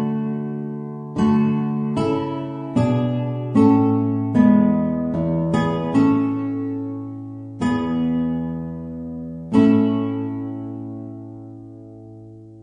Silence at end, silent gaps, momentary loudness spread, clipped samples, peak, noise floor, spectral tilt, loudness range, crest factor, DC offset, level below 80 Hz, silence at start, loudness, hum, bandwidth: 0 s; none; 18 LU; under 0.1%; -2 dBFS; -40 dBFS; -9 dB/octave; 5 LU; 18 dB; under 0.1%; -50 dBFS; 0 s; -20 LUFS; none; 9.4 kHz